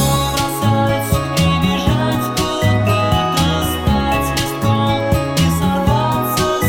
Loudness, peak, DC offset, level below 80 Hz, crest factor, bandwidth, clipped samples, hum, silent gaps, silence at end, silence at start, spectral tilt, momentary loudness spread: -16 LUFS; 0 dBFS; under 0.1%; -28 dBFS; 14 dB; 17.5 kHz; under 0.1%; none; none; 0 s; 0 s; -5 dB/octave; 3 LU